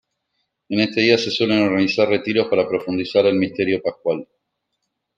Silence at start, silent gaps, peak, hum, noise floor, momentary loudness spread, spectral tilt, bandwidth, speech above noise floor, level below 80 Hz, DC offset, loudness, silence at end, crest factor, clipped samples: 0.7 s; none; -2 dBFS; none; -76 dBFS; 7 LU; -5.5 dB/octave; 7.6 kHz; 57 dB; -64 dBFS; under 0.1%; -19 LUFS; 0.95 s; 18 dB; under 0.1%